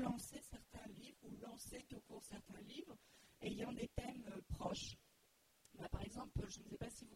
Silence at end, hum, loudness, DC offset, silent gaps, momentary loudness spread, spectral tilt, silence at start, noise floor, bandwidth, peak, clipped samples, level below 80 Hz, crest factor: 0 s; none; -51 LUFS; under 0.1%; none; 11 LU; -5 dB/octave; 0 s; -76 dBFS; 16 kHz; -28 dBFS; under 0.1%; -60 dBFS; 22 dB